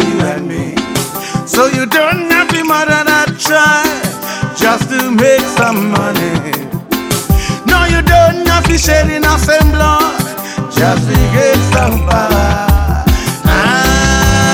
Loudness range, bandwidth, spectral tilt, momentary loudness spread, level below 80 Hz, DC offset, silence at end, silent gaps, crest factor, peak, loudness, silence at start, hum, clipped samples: 2 LU; 18 kHz; -4.5 dB/octave; 8 LU; -20 dBFS; under 0.1%; 0 s; none; 10 dB; 0 dBFS; -11 LUFS; 0 s; none; 0.2%